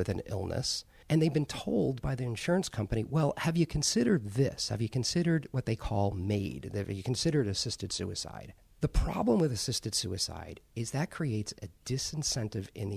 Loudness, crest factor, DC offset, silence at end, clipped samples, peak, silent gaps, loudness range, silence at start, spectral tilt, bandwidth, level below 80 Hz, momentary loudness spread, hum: -32 LUFS; 18 dB; under 0.1%; 0 s; under 0.1%; -14 dBFS; none; 3 LU; 0 s; -5 dB/octave; 15.5 kHz; -44 dBFS; 9 LU; none